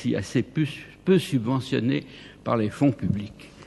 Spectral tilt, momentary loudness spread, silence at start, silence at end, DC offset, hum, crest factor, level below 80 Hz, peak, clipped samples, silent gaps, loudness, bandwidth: -7 dB/octave; 9 LU; 0 s; 0 s; under 0.1%; none; 18 dB; -54 dBFS; -8 dBFS; under 0.1%; none; -25 LUFS; 12 kHz